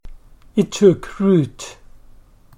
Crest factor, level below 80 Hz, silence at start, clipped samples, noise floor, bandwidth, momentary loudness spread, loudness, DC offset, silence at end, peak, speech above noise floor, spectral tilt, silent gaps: 18 dB; -42 dBFS; 0.05 s; under 0.1%; -45 dBFS; 12 kHz; 17 LU; -17 LUFS; under 0.1%; 0.85 s; -2 dBFS; 29 dB; -7 dB/octave; none